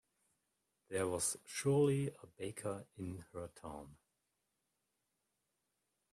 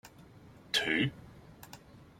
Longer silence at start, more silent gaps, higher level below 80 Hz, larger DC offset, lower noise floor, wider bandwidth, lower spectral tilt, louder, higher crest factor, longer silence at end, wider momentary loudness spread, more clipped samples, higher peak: first, 0.9 s vs 0.05 s; neither; second, -72 dBFS vs -64 dBFS; neither; first, -86 dBFS vs -55 dBFS; second, 14 kHz vs 16.5 kHz; first, -5 dB/octave vs -3.5 dB/octave; second, -39 LUFS vs -31 LUFS; about the same, 18 dB vs 22 dB; first, 2.2 s vs 0.2 s; second, 18 LU vs 25 LU; neither; second, -24 dBFS vs -14 dBFS